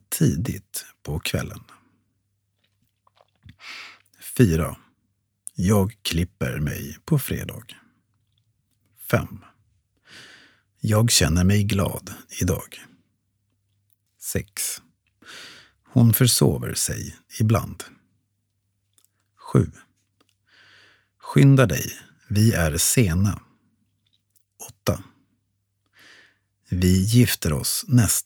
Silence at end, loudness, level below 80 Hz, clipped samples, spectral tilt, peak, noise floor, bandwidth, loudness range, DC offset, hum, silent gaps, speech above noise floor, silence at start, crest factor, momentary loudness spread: 0.05 s; -22 LUFS; -44 dBFS; under 0.1%; -5 dB/octave; -2 dBFS; -73 dBFS; over 20 kHz; 12 LU; under 0.1%; none; none; 52 dB; 0.1 s; 22 dB; 23 LU